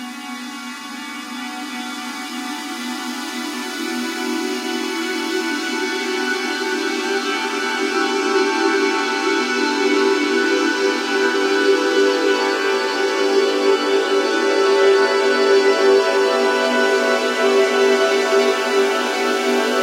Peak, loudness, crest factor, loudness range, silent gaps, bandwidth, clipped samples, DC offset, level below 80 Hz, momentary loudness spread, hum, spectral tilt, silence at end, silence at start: -4 dBFS; -18 LUFS; 14 dB; 9 LU; none; 16 kHz; under 0.1%; under 0.1%; -88 dBFS; 12 LU; none; -1 dB/octave; 0 s; 0 s